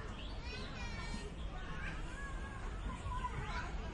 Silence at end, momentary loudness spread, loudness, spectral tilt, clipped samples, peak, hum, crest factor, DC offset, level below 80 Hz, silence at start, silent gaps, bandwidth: 0 s; 4 LU; -45 LUFS; -5 dB/octave; under 0.1%; -28 dBFS; none; 14 dB; under 0.1%; -46 dBFS; 0 s; none; 11 kHz